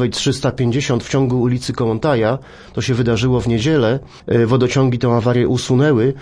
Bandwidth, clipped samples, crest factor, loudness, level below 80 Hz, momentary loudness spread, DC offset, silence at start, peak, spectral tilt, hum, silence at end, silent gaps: 10.5 kHz; under 0.1%; 14 dB; -16 LUFS; -40 dBFS; 5 LU; under 0.1%; 0 s; -2 dBFS; -6.5 dB/octave; none; 0 s; none